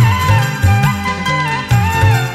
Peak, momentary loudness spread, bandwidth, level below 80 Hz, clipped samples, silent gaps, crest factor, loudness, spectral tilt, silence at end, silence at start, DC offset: -2 dBFS; 4 LU; 15.5 kHz; -30 dBFS; under 0.1%; none; 10 dB; -13 LUFS; -5.5 dB/octave; 0 s; 0 s; under 0.1%